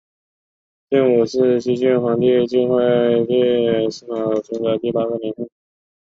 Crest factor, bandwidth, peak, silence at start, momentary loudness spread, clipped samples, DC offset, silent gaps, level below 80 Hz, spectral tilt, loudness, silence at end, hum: 14 dB; 7.6 kHz; -4 dBFS; 0.9 s; 8 LU; under 0.1%; under 0.1%; none; -60 dBFS; -7 dB/octave; -18 LUFS; 0.65 s; none